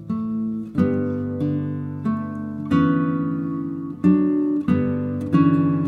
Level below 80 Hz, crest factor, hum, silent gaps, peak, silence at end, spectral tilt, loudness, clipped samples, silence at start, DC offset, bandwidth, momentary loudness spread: -54 dBFS; 16 dB; none; none; -4 dBFS; 0 s; -10 dB/octave; -22 LUFS; under 0.1%; 0 s; under 0.1%; 4.5 kHz; 9 LU